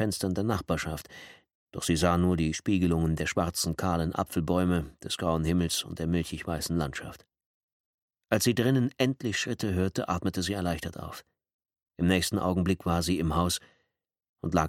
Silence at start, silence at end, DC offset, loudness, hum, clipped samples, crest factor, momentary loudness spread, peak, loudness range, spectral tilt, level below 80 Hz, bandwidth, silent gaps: 0 s; 0 s; under 0.1%; -29 LUFS; none; under 0.1%; 20 dB; 10 LU; -8 dBFS; 3 LU; -5 dB/octave; -46 dBFS; 16.5 kHz; 1.55-1.67 s, 7.46-8.08 s, 11.54-11.59 s, 14.29-14.34 s